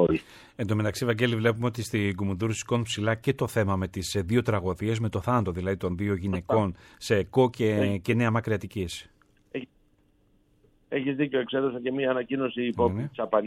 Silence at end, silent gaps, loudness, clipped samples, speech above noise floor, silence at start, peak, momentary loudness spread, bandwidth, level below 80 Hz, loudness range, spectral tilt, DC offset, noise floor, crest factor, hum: 0 s; none; -27 LUFS; under 0.1%; 38 dB; 0 s; -8 dBFS; 8 LU; 15.5 kHz; -54 dBFS; 5 LU; -6 dB/octave; under 0.1%; -64 dBFS; 18 dB; none